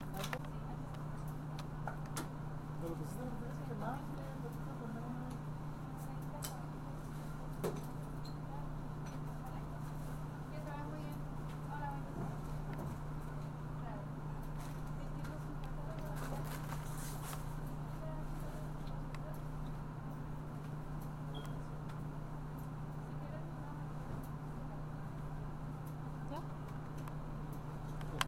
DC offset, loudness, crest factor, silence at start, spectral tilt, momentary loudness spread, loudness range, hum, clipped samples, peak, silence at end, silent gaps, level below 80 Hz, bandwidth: under 0.1%; -45 LUFS; 30 dB; 0 s; -6.5 dB/octave; 3 LU; 2 LU; none; under 0.1%; -12 dBFS; 0 s; none; -50 dBFS; 16.5 kHz